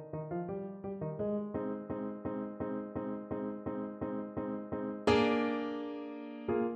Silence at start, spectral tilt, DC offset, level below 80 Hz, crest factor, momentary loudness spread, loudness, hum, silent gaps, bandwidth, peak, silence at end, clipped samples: 0 s; -7 dB/octave; under 0.1%; -60 dBFS; 22 dB; 11 LU; -37 LUFS; none; none; 9 kHz; -14 dBFS; 0 s; under 0.1%